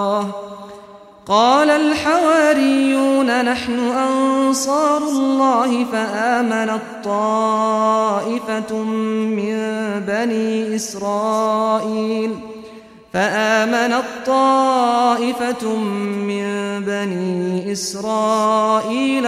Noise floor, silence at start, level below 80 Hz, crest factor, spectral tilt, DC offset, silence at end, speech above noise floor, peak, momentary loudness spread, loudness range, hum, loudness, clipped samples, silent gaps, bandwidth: -41 dBFS; 0 s; -58 dBFS; 16 dB; -4.5 dB/octave; under 0.1%; 0 s; 24 dB; -2 dBFS; 8 LU; 5 LU; none; -18 LUFS; under 0.1%; none; 15 kHz